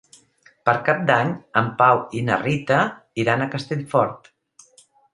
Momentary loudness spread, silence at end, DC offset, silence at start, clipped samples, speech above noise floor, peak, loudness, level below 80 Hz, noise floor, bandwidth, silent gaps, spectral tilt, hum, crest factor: 8 LU; 0.95 s; under 0.1%; 0.65 s; under 0.1%; 36 dB; 0 dBFS; -21 LUFS; -60 dBFS; -56 dBFS; 11.5 kHz; none; -6.5 dB/octave; none; 22 dB